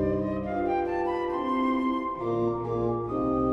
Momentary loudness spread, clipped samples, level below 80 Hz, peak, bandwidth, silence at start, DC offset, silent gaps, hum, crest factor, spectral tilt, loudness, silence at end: 3 LU; under 0.1%; -48 dBFS; -14 dBFS; 6.6 kHz; 0 s; under 0.1%; none; none; 14 dB; -9 dB/octave; -28 LUFS; 0 s